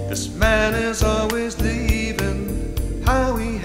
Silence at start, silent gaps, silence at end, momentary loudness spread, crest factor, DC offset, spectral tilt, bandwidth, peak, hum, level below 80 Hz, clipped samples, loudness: 0 s; none; 0 s; 8 LU; 16 dB; under 0.1%; -5 dB/octave; 16.5 kHz; -4 dBFS; none; -26 dBFS; under 0.1%; -21 LUFS